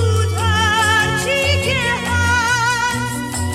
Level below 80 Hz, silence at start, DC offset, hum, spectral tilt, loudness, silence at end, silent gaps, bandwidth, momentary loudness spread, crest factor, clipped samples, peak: -36 dBFS; 0 s; under 0.1%; none; -3.5 dB/octave; -16 LUFS; 0 s; none; 15.5 kHz; 5 LU; 12 dB; under 0.1%; -4 dBFS